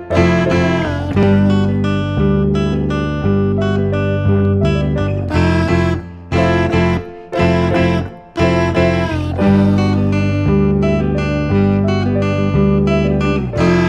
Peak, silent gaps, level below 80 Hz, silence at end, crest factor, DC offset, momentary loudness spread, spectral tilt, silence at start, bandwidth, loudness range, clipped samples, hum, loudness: 0 dBFS; none; -28 dBFS; 0 s; 14 dB; under 0.1%; 5 LU; -8 dB/octave; 0 s; 8.6 kHz; 1 LU; under 0.1%; none; -15 LUFS